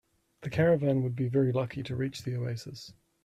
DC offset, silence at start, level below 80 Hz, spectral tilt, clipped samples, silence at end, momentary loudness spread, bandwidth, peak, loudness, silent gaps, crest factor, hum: under 0.1%; 0.4 s; -60 dBFS; -7.5 dB/octave; under 0.1%; 0.3 s; 18 LU; 13 kHz; -14 dBFS; -30 LUFS; none; 16 dB; none